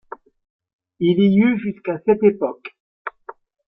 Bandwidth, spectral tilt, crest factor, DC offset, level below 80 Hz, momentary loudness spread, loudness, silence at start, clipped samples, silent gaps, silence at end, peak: 3.9 kHz; -11.5 dB/octave; 18 dB; under 0.1%; -60 dBFS; 20 LU; -18 LUFS; 1 s; under 0.1%; 2.80-3.05 s; 0.6 s; -2 dBFS